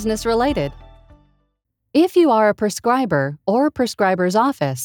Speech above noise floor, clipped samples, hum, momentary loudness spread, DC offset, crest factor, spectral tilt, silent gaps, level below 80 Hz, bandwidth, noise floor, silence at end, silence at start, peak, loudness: 55 dB; under 0.1%; none; 6 LU; under 0.1%; 14 dB; -5.5 dB/octave; none; -44 dBFS; over 20 kHz; -72 dBFS; 0 s; 0 s; -4 dBFS; -18 LUFS